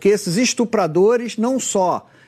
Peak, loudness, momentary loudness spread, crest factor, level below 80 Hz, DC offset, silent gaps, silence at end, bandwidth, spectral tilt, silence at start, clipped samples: -4 dBFS; -18 LUFS; 4 LU; 14 dB; -64 dBFS; under 0.1%; none; 0.25 s; 14 kHz; -4.5 dB/octave; 0 s; under 0.1%